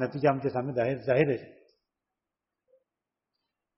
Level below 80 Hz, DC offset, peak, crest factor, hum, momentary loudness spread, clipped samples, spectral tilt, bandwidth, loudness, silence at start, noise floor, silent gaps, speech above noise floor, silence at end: -68 dBFS; under 0.1%; -10 dBFS; 22 dB; none; 5 LU; under 0.1%; -6.5 dB/octave; 5.8 kHz; -28 LUFS; 0 s; -89 dBFS; none; 61 dB; 2.3 s